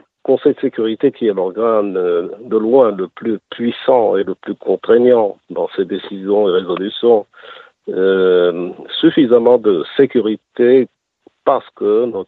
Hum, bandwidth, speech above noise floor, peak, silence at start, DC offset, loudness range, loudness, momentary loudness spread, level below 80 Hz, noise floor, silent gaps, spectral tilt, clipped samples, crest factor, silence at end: none; 4.3 kHz; 39 dB; 0 dBFS; 0.3 s; under 0.1%; 2 LU; -15 LUFS; 11 LU; -64 dBFS; -53 dBFS; none; -8.5 dB/octave; under 0.1%; 14 dB; 0.05 s